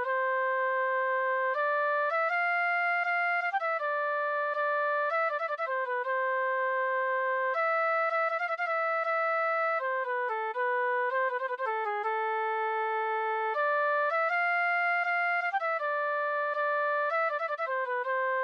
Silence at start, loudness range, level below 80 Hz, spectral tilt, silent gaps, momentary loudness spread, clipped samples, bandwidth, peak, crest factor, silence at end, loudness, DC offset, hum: 0 s; 2 LU; under -90 dBFS; -0.5 dB/octave; none; 4 LU; under 0.1%; 7.6 kHz; -20 dBFS; 10 dB; 0 s; -29 LUFS; under 0.1%; none